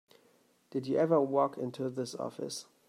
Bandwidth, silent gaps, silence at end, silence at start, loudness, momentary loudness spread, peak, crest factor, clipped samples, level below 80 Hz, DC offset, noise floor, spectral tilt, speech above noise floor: 14.5 kHz; none; 0.25 s; 0.75 s; -33 LUFS; 13 LU; -16 dBFS; 18 dB; under 0.1%; -84 dBFS; under 0.1%; -68 dBFS; -6 dB/octave; 36 dB